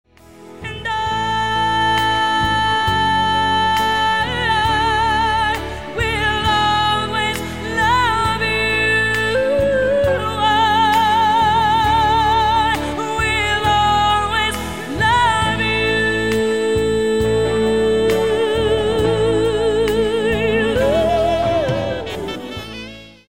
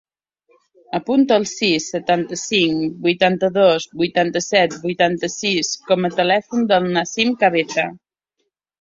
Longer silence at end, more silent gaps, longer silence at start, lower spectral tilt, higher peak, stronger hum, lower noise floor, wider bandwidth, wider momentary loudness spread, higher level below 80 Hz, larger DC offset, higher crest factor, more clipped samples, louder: second, 0.15 s vs 0.85 s; neither; second, 0.25 s vs 0.95 s; about the same, -4.5 dB/octave vs -4 dB/octave; about the same, -2 dBFS vs -2 dBFS; neither; second, -41 dBFS vs -74 dBFS; first, 17 kHz vs 7.8 kHz; about the same, 7 LU vs 5 LU; first, -34 dBFS vs -60 dBFS; first, 0.7% vs under 0.1%; about the same, 14 dB vs 18 dB; neither; about the same, -16 LUFS vs -18 LUFS